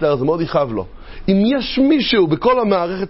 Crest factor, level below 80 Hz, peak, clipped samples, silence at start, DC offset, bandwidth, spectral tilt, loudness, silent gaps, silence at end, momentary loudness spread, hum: 14 dB; -38 dBFS; -2 dBFS; under 0.1%; 0 s; under 0.1%; 5.8 kHz; -10 dB/octave; -16 LUFS; none; 0 s; 10 LU; none